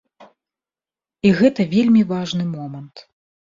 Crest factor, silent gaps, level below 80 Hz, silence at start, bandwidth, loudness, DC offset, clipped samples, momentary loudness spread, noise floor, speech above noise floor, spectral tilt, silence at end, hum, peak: 18 dB; none; -56 dBFS; 0.2 s; 7.6 kHz; -17 LUFS; under 0.1%; under 0.1%; 16 LU; under -90 dBFS; over 73 dB; -7 dB/octave; 0.6 s; none; -2 dBFS